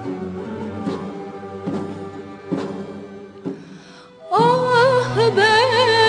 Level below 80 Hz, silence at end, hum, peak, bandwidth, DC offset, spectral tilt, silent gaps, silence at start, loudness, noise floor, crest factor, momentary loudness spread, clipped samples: -58 dBFS; 0 s; none; -4 dBFS; 10.5 kHz; under 0.1%; -5 dB/octave; none; 0 s; -18 LUFS; -42 dBFS; 16 dB; 19 LU; under 0.1%